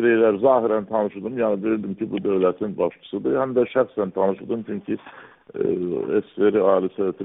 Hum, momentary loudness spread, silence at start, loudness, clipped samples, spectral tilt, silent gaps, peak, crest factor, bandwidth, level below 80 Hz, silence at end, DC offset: none; 10 LU; 0 s; -22 LUFS; under 0.1%; -11.5 dB/octave; none; -4 dBFS; 18 dB; 3.9 kHz; -64 dBFS; 0 s; under 0.1%